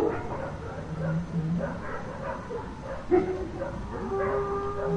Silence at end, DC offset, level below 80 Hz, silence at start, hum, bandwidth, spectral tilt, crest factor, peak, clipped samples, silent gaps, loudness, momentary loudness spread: 0 s; under 0.1%; -44 dBFS; 0 s; none; 10 kHz; -8 dB/octave; 18 dB; -12 dBFS; under 0.1%; none; -31 LUFS; 10 LU